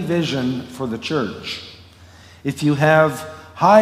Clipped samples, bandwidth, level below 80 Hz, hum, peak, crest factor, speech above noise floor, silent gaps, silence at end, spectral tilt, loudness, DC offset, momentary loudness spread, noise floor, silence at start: under 0.1%; 16 kHz; -56 dBFS; none; 0 dBFS; 18 dB; 25 dB; none; 0 s; -6 dB/octave; -19 LUFS; under 0.1%; 17 LU; -44 dBFS; 0 s